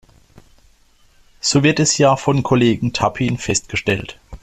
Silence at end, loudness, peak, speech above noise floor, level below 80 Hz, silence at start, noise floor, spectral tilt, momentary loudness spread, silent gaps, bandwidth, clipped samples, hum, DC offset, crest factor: 0.05 s; -17 LUFS; -2 dBFS; 36 dB; -44 dBFS; 1.45 s; -53 dBFS; -4.5 dB/octave; 8 LU; none; 13 kHz; under 0.1%; none; under 0.1%; 16 dB